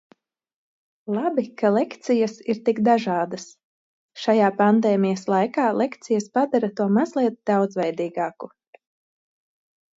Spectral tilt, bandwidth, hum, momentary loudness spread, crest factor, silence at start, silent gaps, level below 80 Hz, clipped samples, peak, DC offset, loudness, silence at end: -6.5 dB/octave; 7.8 kHz; none; 10 LU; 16 dB; 1.05 s; 3.64-4.09 s; -72 dBFS; under 0.1%; -6 dBFS; under 0.1%; -22 LUFS; 1.5 s